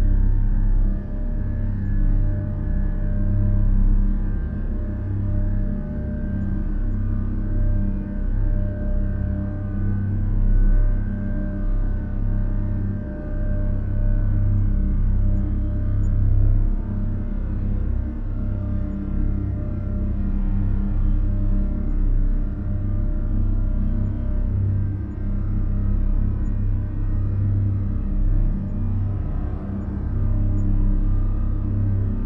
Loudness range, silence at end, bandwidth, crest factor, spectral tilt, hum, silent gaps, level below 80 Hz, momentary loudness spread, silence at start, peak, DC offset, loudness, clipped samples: 2 LU; 0 s; 2.1 kHz; 14 dB; -12 dB/octave; none; none; -22 dBFS; 5 LU; 0 s; -6 dBFS; under 0.1%; -25 LUFS; under 0.1%